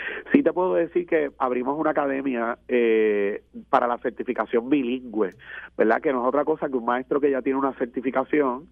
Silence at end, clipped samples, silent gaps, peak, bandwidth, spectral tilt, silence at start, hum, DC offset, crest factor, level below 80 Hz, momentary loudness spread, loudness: 0.05 s; under 0.1%; none; -2 dBFS; 4.4 kHz; -8.5 dB/octave; 0 s; none; under 0.1%; 22 dB; -60 dBFS; 7 LU; -24 LUFS